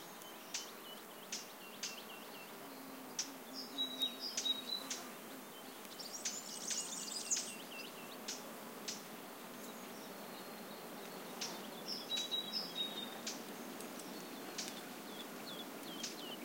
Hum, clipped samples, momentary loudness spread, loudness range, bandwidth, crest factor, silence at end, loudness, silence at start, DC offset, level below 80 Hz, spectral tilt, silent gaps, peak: none; under 0.1%; 12 LU; 6 LU; 16.5 kHz; 24 dB; 0 s; -44 LUFS; 0 s; under 0.1%; under -90 dBFS; -1 dB/octave; none; -22 dBFS